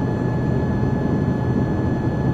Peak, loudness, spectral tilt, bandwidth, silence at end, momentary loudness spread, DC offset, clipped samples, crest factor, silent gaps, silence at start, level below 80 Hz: -8 dBFS; -21 LUFS; -9.5 dB/octave; 7.2 kHz; 0 s; 1 LU; under 0.1%; under 0.1%; 12 dB; none; 0 s; -36 dBFS